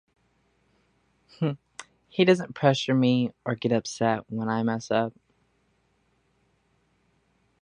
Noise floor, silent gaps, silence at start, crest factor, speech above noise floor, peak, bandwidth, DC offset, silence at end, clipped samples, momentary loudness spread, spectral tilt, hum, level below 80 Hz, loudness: -69 dBFS; none; 1.4 s; 24 dB; 45 dB; -4 dBFS; 10.5 kHz; under 0.1%; 2.55 s; under 0.1%; 12 LU; -6 dB/octave; none; -68 dBFS; -26 LUFS